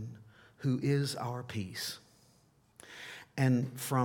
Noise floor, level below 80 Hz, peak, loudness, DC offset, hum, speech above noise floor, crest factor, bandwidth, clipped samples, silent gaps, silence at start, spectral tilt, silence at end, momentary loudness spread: -67 dBFS; -74 dBFS; -16 dBFS; -34 LUFS; under 0.1%; none; 35 dB; 18 dB; 18.5 kHz; under 0.1%; none; 0 s; -6 dB/octave; 0 s; 18 LU